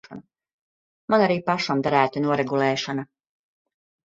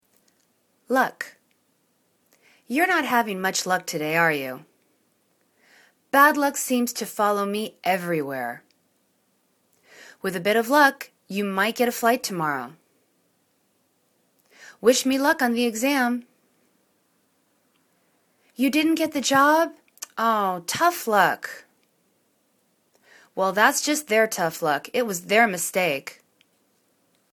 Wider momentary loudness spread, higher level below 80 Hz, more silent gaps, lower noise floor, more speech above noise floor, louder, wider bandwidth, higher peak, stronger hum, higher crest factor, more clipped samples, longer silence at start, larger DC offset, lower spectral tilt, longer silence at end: first, 18 LU vs 14 LU; first, -66 dBFS vs -74 dBFS; first, 0.53-1.08 s vs none; second, -44 dBFS vs -68 dBFS; second, 22 dB vs 46 dB; about the same, -22 LUFS vs -22 LUFS; second, 7.8 kHz vs 19 kHz; about the same, -4 dBFS vs -2 dBFS; neither; about the same, 22 dB vs 24 dB; neither; second, 0.1 s vs 0.9 s; neither; first, -5.5 dB/octave vs -3 dB/octave; about the same, 1.1 s vs 1.2 s